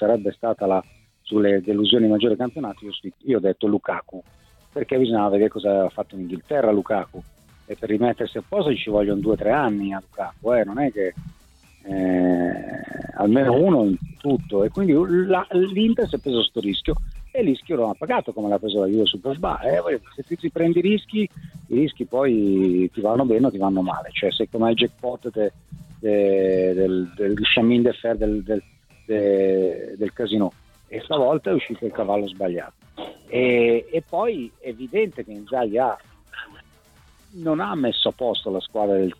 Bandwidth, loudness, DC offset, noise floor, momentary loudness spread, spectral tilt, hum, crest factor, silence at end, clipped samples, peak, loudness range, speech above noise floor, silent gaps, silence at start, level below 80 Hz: 11.5 kHz; -22 LUFS; under 0.1%; -54 dBFS; 12 LU; -7.5 dB/octave; none; 18 dB; 0.05 s; under 0.1%; -4 dBFS; 4 LU; 32 dB; none; 0 s; -44 dBFS